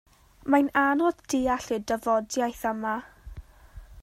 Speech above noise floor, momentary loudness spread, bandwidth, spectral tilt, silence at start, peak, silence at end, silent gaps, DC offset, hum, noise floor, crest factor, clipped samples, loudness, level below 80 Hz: 22 dB; 16 LU; 16 kHz; -4 dB/octave; 0.45 s; -8 dBFS; 0 s; none; under 0.1%; none; -48 dBFS; 20 dB; under 0.1%; -26 LUFS; -50 dBFS